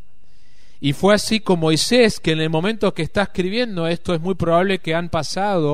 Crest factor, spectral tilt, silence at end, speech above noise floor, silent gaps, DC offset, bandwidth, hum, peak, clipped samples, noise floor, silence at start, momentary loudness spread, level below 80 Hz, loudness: 18 dB; -5 dB/octave; 0 s; 37 dB; none; 3%; 15.5 kHz; none; -2 dBFS; under 0.1%; -56 dBFS; 0.8 s; 7 LU; -44 dBFS; -19 LUFS